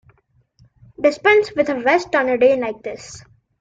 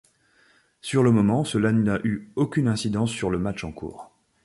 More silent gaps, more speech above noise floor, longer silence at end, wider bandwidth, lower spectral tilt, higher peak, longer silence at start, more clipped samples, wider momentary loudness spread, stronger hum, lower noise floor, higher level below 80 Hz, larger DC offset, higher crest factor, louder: neither; first, 42 dB vs 38 dB; about the same, 0.4 s vs 0.4 s; second, 9 kHz vs 11.5 kHz; second, -4 dB/octave vs -6.5 dB/octave; first, -2 dBFS vs -8 dBFS; first, 1 s vs 0.85 s; neither; about the same, 16 LU vs 15 LU; neither; about the same, -60 dBFS vs -61 dBFS; second, -56 dBFS vs -50 dBFS; neither; about the same, 18 dB vs 16 dB; first, -17 LUFS vs -23 LUFS